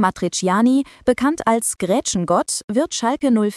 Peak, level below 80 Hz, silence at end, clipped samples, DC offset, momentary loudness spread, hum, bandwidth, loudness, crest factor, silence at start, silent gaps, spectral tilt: -2 dBFS; -52 dBFS; 0 s; under 0.1%; under 0.1%; 4 LU; none; 15 kHz; -19 LUFS; 16 dB; 0 s; 2.64-2.68 s; -4.5 dB/octave